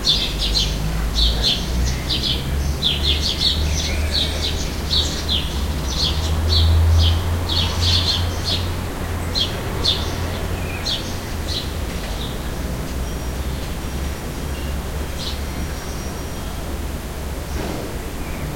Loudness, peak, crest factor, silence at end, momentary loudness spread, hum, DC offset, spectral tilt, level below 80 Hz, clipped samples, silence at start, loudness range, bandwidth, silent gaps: -21 LUFS; -2 dBFS; 18 dB; 0 s; 11 LU; none; under 0.1%; -4 dB/octave; -26 dBFS; under 0.1%; 0 s; 9 LU; 16.5 kHz; none